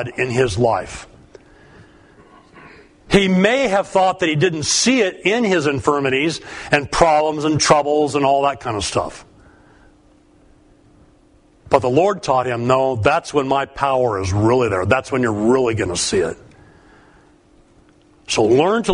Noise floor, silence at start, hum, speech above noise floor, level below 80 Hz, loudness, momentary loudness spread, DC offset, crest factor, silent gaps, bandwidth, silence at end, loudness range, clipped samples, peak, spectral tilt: -52 dBFS; 0 s; none; 36 dB; -44 dBFS; -17 LUFS; 6 LU; under 0.1%; 18 dB; none; 11 kHz; 0 s; 6 LU; under 0.1%; 0 dBFS; -4.5 dB/octave